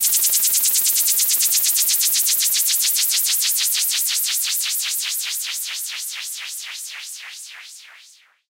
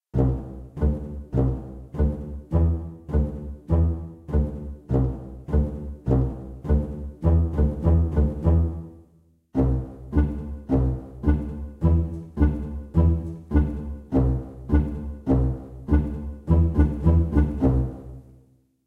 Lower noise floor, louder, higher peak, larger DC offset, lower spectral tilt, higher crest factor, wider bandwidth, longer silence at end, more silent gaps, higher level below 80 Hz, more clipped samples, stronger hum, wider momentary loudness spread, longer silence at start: second, -50 dBFS vs -59 dBFS; first, -16 LUFS vs -25 LUFS; about the same, -4 dBFS vs -6 dBFS; neither; second, 5.5 dB/octave vs -11 dB/octave; about the same, 18 dB vs 18 dB; first, 16.5 kHz vs 3.1 kHz; about the same, 0.55 s vs 0.65 s; neither; second, -86 dBFS vs -26 dBFS; neither; neither; first, 15 LU vs 12 LU; second, 0 s vs 0.15 s